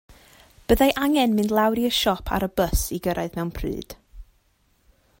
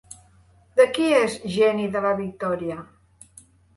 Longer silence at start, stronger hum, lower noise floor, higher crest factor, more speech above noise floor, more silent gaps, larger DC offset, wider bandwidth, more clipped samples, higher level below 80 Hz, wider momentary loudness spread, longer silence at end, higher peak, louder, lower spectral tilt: about the same, 0.7 s vs 0.75 s; neither; first, -64 dBFS vs -56 dBFS; about the same, 20 dB vs 20 dB; first, 42 dB vs 33 dB; neither; neither; first, 16.5 kHz vs 11.5 kHz; neither; first, -36 dBFS vs -58 dBFS; first, 13 LU vs 10 LU; about the same, 0.95 s vs 0.95 s; about the same, -4 dBFS vs -4 dBFS; about the same, -22 LUFS vs -22 LUFS; about the same, -4.5 dB/octave vs -5 dB/octave